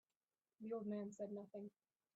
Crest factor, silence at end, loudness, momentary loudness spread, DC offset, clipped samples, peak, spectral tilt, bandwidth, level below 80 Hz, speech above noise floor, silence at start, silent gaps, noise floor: 14 dB; 0.5 s; -50 LUFS; 10 LU; under 0.1%; under 0.1%; -38 dBFS; -9 dB/octave; 7.6 kHz; under -90 dBFS; over 41 dB; 0.6 s; none; under -90 dBFS